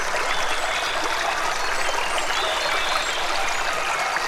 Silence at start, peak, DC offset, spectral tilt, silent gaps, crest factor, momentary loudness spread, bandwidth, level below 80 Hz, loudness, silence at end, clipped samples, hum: 0 s; -8 dBFS; under 0.1%; -0.5 dB/octave; none; 14 dB; 2 LU; 16 kHz; -40 dBFS; -23 LUFS; 0 s; under 0.1%; none